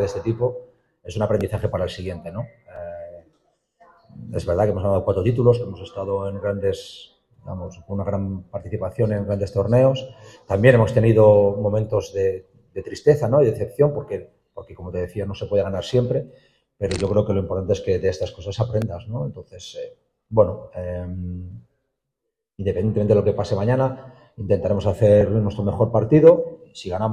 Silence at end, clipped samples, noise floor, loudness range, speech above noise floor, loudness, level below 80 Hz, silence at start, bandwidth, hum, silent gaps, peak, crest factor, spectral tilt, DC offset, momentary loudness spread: 0 s; under 0.1%; -81 dBFS; 9 LU; 60 dB; -21 LUFS; -48 dBFS; 0 s; 12 kHz; none; none; 0 dBFS; 20 dB; -8 dB/octave; under 0.1%; 19 LU